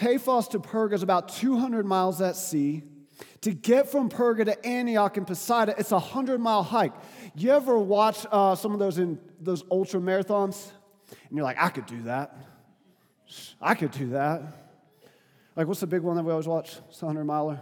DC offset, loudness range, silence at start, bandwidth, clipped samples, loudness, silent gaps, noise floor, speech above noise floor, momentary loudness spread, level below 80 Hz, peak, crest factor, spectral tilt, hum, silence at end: under 0.1%; 7 LU; 0 s; 19.5 kHz; under 0.1%; -26 LUFS; none; -64 dBFS; 38 dB; 11 LU; -82 dBFS; -4 dBFS; 22 dB; -5.5 dB/octave; none; 0 s